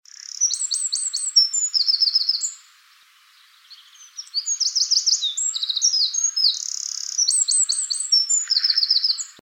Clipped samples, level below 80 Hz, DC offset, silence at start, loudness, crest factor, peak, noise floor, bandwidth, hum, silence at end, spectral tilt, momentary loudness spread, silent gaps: under 0.1%; under -90 dBFS; under 0.1%; 0.35 s; -18 LUFS; 18 dB; -6 dBFS; -54 dBFS; 17 kHz; none; 0.1 s; 8 dB/octave; 9 LU; none